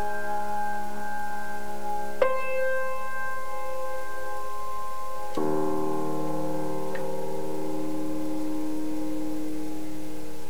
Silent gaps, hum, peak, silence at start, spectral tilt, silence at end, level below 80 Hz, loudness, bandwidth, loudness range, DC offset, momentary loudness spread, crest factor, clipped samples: none; none; -8 dBFS; 0 s; -5.5 dB/octave; 0 s; -56 dBFS; -32 LUFS; over 20 kHz; 2 LU; 7%; 8 LU; 24 dB; under 0.1%